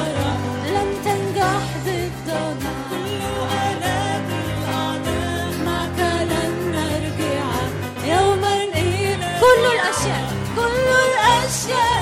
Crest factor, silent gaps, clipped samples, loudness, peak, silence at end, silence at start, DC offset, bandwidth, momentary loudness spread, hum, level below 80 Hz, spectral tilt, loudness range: 16 dB; none; under 0.1%; -20 LUFS; -4 dBFS; 0 s; 0 s; under 0.1%; 16.5 kHz; 9 LU; none; -40 dBFS; -4.5 dB/octave; 6 LU